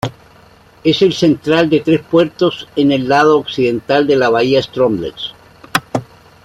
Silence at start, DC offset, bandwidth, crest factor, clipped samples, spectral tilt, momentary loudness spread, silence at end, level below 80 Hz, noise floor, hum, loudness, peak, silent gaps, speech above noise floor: 0.05 s; under 0.1%; 16 kHz; 14 dB; under 0.1%; -6 dB/octave; 11 LU; 0.4 s; -50 dBFS; -44 dBFS; none; -14 LUFS; 0 dBFS; none; 32 dB